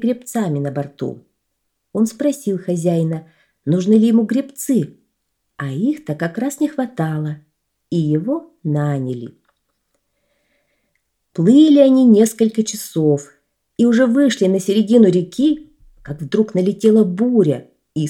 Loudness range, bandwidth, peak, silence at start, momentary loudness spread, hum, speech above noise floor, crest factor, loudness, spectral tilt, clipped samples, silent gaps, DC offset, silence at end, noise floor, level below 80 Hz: 9 LU; 17 kHz; 0 dBFS; 0 s; 16 LU; none; 57 dB; 16 dB; -16 LUFS; -6.5 dB/octave; under 0.1%; none; under 0.1%; 0 s; -73 dBFS; -60 dBFS